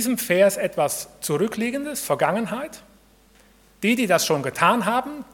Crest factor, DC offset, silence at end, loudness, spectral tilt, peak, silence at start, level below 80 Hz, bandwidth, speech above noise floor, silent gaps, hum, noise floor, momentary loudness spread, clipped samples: 22 dB; under 0.1%; 0.1 s; -22 LUFS; -4 dB/octave; -2 dBFS; 0 s; -60 dBFS; 18 kHz; 33 dB; none; none; -55 dBFS; 9 LU; under 0.1%